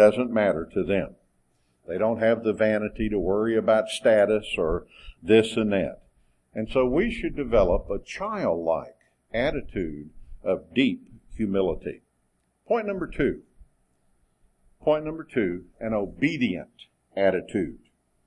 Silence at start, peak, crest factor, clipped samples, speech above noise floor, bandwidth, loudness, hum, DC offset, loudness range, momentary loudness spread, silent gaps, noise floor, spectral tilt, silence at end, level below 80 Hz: 0 s; -6 dBFS; 20 dB; under 0.1%; 46 dB; 12 kHz; -25 LUFS; none; under 0.1%; 7 LU; 13 LU; none; -71 dBFS; -6.5 dB/octave; 0.5 s; -44 dBFS